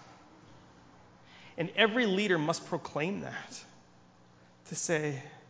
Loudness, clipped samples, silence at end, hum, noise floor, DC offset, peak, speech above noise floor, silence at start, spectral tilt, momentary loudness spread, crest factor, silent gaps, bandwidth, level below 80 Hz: -31 LUFS; under 0.1%; 0.1 s; none; -60 dBFS; under 0.1%; -10 dBFS; 28 dB; 0 s; -4 dB/octave; 16 LU; 24 dB; none; 8 kHz; -72 dBFS